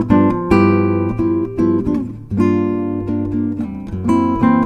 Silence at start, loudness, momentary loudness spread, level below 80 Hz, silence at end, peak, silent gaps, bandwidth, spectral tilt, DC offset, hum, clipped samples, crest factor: 0 s; -17 LUFS; 8 LU; -36 dBFS; 0 s; 0 dBFS; none; 8.8 kHz; -9.5 dB/octave; under 0.1%; none; under 0.1%; 16 dB